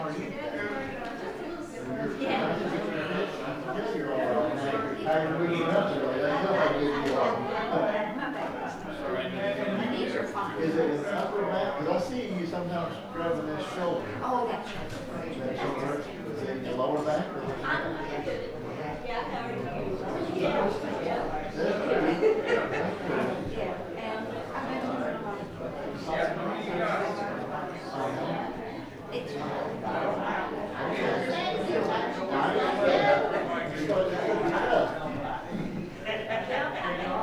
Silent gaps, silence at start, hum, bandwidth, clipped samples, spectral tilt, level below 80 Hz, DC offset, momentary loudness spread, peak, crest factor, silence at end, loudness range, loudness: none; 0 s; none; over 20 kHz; under 0.1%; -6 dB/octave; -52 dBFS; under 0.1%; 9 LU; -10 dBFS; 20 dB; 0 s; 5 LU; -30 LUFS